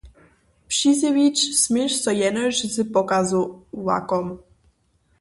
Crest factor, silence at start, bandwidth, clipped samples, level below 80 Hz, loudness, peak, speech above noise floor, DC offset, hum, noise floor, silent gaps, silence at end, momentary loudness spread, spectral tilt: 16 dB; 0.05 s; 11.5 kHz; under 0.1%; -56 dBFS; -21 LUFS; -6 dBFS; 43 dB; under 0.1%; none; -64 dBFS; none; 0.8 s; 8 LU; -3 dB/octave